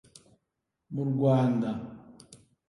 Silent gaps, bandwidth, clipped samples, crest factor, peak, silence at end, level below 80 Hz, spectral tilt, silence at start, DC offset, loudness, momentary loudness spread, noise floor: none; 11.5 kHz; under 0.1%; 20 dB; -12 dBFS; 0.35 s; -66 dBFS; -9 dB/octave; 0.9 s; under 0.1%; -28 LUFS; 19 LU; -83 dBFS